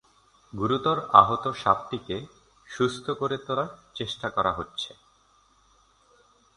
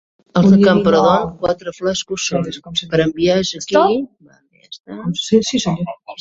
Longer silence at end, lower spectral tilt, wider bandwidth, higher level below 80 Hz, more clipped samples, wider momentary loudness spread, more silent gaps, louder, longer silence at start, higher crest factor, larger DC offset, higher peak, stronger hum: first, 1.7 s vs 0.05 s; about the same, -5.5 dB/octave vs -5.5 dB/octave; first, 11 kHz vs 7.8 kHz; second, -56 dBFS vs -48 dBFS; neither; first, 17 LU vs 12 LU; second, none vs 4.80-4.84 s; second, -26 LUFS vs -16 LUFS; first, 0.55 s vs 0.35 s; first, 28 dB vs 16 dB; neither; about the same, 0 dBFS vs 0 dBFS; neither